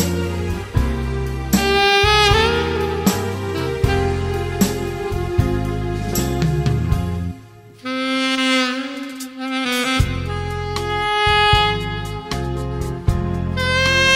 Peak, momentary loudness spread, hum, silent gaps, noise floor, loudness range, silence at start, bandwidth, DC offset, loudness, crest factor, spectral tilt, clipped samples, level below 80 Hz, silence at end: 0 dBFS; 11 LU; none; none; -41 dBFS; 4 LU; 0 s; 16 kHz; under 0.1%; -19 LUFS; 18 dB; -4.5 dB/octave; under 0.1%; -28 dBFS; 0 s